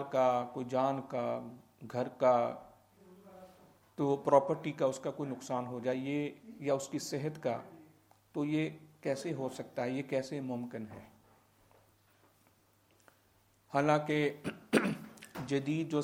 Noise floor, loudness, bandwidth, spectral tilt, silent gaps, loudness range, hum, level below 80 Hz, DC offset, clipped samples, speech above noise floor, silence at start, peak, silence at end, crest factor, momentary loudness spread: -69 dBFS; -35 LUFS; 16.5 kHz; -6 dB/octave; none; 8 LU; none; -76 dBFS; under 0.1%; under 0.1%; 35 dB; 0 s; -12 dBFS; 0 s; 24 dB; 15 LU